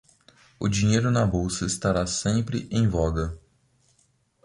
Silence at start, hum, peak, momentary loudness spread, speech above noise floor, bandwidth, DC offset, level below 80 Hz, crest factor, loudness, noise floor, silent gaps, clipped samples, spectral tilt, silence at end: 0.6 s; none; -10 dBFS; 9 LU; 43 dB; 11.5 kHz; under 0.1%; -40 dBFS; 16 dB; -25 LUFS; -66 dBFS; none; under 0.1%; -5.5 dB/octave; 1.1 s